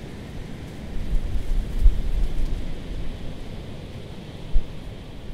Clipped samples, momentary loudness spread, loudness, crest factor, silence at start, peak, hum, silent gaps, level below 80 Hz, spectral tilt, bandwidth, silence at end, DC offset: under 0.1%; 13 LU; -32 LUFS; 20 dB; 0 s; -2 dBFS; none; none; -24 dBFS; -6.5 dB/octave; 6.8 kHz; 0 s; under 0.1%